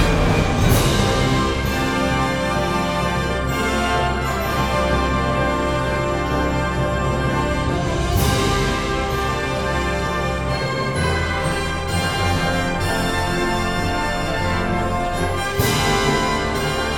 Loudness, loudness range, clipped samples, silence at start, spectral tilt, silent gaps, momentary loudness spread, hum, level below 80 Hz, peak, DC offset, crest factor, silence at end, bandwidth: -20 LUFS; 2 LU; under 0.1%; 0 s; -5 dB/octave; none; 4 LU; none; -28 dBFS; -2 dBFS; under 0.1%; 16 dB; 0 s; 19.5 kHz